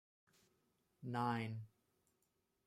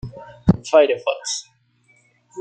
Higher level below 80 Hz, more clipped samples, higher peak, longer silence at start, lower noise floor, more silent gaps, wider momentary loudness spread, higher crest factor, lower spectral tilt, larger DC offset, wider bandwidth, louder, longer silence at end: second, -86 dBFS vs -44 dBFS; neither; second, -26 dBFS vs -2 dBFS; first, 1 s vs 0.05 s; first, -84 dBFS vs -59 dBFS; neither; second, 15 LU vs 18 LU; about the same, 22 dB vs 20 dB; first, -7 dB/octave vs -5 dB/octave; neither; first, 13.5 kHz vs 9.4 kHz; second, -43 LUFS vs -19 LUFS; first, 1 s vs 0 s